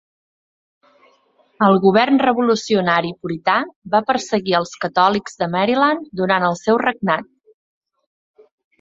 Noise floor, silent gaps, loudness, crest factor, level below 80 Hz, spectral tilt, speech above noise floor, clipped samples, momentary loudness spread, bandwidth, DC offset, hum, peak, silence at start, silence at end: -58 dBFS; 3.76-3.82 s; -17 LUFS; 18 dB; -60 dBFS; -5.5 dB/octave; 41 dB; under 0.1%; 8 LU; 7.8 kHz; under 0.1%; none; -2 dBFS; 1.6 s; 1.6 s